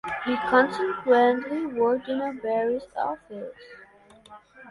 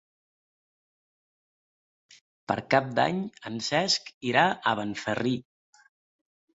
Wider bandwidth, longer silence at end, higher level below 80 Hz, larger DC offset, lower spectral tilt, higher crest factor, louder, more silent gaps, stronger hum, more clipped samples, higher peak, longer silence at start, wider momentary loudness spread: first, 11.5 kHz vs 8 kHz; second, 0 s vs 1.15 s; about the same, -64 dBFS vs -68 dBFS; neither; first, -5.5 dB/octave vs -4 dB/octave; second, 18 dB vs 24 dB; first, -24 LUFS vs -27 LUFS; second, none vs 4.14-4.21 s; neither; neither; about the same, -8 dBFS vs -6 dBFS; second, 0.05 s vs 2.5 s; first, 14 LU vs 10 LU